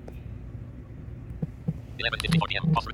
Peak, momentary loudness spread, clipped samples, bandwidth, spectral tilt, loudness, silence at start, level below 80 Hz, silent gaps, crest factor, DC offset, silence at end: -10 dBFS; 17 LU; under 0.1%; 12.5 kHz; -5.5 dB/octave; -28 LUFS; 0 s; -44 dBFS; none; 20 dB; under 0.1%; 0 s